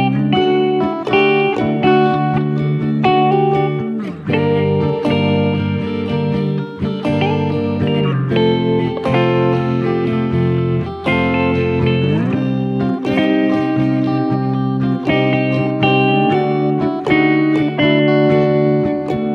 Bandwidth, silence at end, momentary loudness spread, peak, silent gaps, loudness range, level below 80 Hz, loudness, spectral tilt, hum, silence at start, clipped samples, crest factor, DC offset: 6.6 kHz; 0 s; 5 LU; -2 dBFS; none; 3 LU; -44 dBFS; -16 LUFS; -8.5 dB/octave; none; 0 s; under 0.1%; 14 dB; under 0.1%